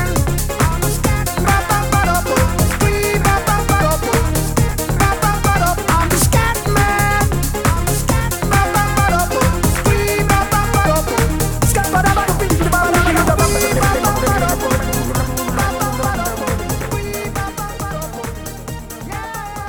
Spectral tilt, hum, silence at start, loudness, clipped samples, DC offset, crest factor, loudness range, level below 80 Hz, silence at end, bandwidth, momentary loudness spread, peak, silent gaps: -4.5 dB/octave; none; 0 s; -16 LUFS; under 0.1%; under 0.1%; 14 dB; 5 LU; -22 dBFS; 0 s; over 20 kHz; 9 LU; -2 dBFS; none